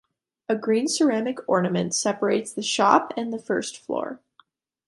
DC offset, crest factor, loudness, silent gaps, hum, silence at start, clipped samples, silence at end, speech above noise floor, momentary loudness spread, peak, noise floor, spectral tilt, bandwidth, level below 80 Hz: under 0.1%; 22 dB; -24 LUFS; none; none; 0.5 s; under 0.1%; 0.7 s; 38 dB; 11 LU; -2 dBFS; -61 dBFS; -4 dB/octave; 11.5 kHz; -70 dBFS